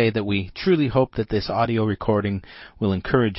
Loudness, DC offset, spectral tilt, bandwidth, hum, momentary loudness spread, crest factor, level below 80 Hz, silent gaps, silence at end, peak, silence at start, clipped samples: -23 LUFS; under 0.1%; -10.5 dB/octave; 5.8 kHz; none; 7 LU; 16 dB; -44 dBFS; none; 0 s; -6 dBFS; 0 s; under 0.1%